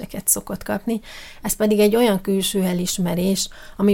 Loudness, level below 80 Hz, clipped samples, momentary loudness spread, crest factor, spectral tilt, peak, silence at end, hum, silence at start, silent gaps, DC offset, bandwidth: -20 LUFS; -44 dBFS; under 0.1%; 11 LU; 18 dB; -4.5 dB/octave; -4 dBFS; 0 s; none; 0 s; none; under 0.1%; 17 kHz